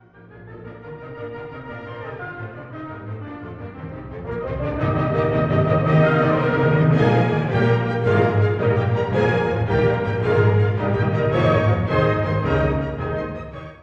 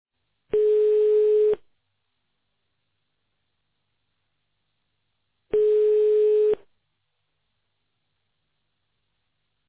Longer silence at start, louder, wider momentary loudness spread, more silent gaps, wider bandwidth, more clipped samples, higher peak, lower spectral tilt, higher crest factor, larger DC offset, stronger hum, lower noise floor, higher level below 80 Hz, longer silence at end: second, 0.2 s vs 0.55 s; about the same, -19 LUFS vs -21 LUFS; first, 17 LU vs 8 LU; neither; first, 6.8 kHz vs 4 kHz; neither; first, -4 dBFS vs -14 dBFS; about the same, -9 dB/octave vs -9 dB/octave; about the same, 16 dB vs 12 dB; neither; neither; second, -43 dBFS vs -78 dBFS; first, -40 dBFS vs -64 dBFS; second, 0.05 s vs 3.1 s